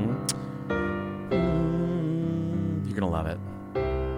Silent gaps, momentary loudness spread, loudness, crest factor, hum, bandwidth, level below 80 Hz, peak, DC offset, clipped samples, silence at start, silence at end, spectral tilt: none; 7 LU; -29 LUFS; 16 dB; none; 16 kHz; -40 dBFS; -12 dBFS; under 0.1%; under 0.1%; 0 s; 0 s; -6.5 dB/octave